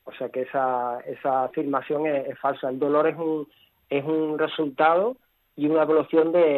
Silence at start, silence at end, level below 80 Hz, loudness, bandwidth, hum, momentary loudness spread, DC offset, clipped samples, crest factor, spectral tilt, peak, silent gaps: 0.05 s; 0 s; -74 dBFS; -24 LUFS; 13 kHz; none; 9 LU; under 0.1%; under 0.1%; 16 dB; -9 dB/octave; -8 dBFS; none